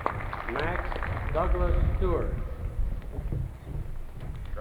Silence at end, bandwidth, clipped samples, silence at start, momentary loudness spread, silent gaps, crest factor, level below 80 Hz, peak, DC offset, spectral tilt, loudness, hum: 0 s; 5 kHz; under 0.1%; 0 s; 12 LU; none; 22 dB; -32 dBFS; -8 dBFS; under 0.1%; -8 dB/octave; -32 LUFS; none